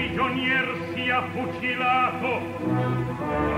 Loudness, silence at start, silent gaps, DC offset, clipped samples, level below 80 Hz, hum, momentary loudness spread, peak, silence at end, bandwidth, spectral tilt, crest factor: -25 LUFS; 0 s; none; under 0.1%; under 0.1%; -46 dBFS; none; 6 LU; -12 dBFS; 0 s; 15.5 kHz; -6.5 dB/octave; 14 dB